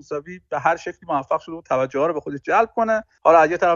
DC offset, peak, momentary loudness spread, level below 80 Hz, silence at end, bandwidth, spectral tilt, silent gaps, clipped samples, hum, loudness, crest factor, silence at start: under 0.1%; -2 dBFS; 13 LU; -58 dBFS; 0 s; 7.4 kHz; -5.5 dB/octave; none; under 0.1%; none; -20 LUFS; 18 dB; 0.1 s